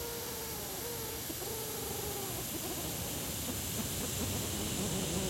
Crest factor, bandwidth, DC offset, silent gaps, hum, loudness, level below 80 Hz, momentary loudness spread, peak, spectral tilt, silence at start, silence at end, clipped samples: 16 dB; 16.5 kHz; under 0.1%; none; none; -36 LUFS; -52 dBFS; 4 LU; -22 dBFS; -3 dB/octave; 0 s; 0 s; under 0.1%